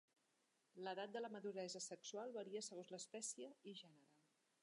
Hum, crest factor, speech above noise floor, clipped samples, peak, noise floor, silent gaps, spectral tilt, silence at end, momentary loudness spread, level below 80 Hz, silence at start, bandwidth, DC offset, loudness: none; 16 dB; 32 dB; under 0.1%; -38 dBFS; -85 dBFS; none; -2.5 dB/octave; 0.6 s; 9 LU; under -90 dBFS; 0.75 s; 11 kHz; under 0.1%; -52 LUFS